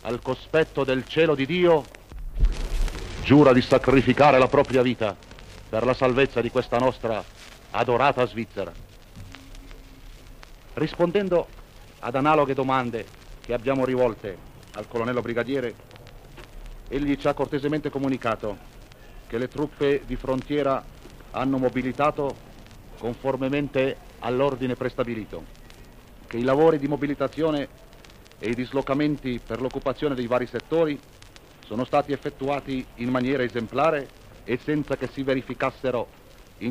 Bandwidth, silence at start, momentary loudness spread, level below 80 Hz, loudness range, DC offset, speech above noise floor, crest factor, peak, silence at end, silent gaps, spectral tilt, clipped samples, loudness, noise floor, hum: 15.5 kHz; 0.05 s; 16 LU; -40 dBFS; 8 LU; 0.1%; 24 dB; 22 dB; -4 dBFS; 0 s; none; -7 dB/octave; under 0.1%; -24 LUFS; -48 dBFS; none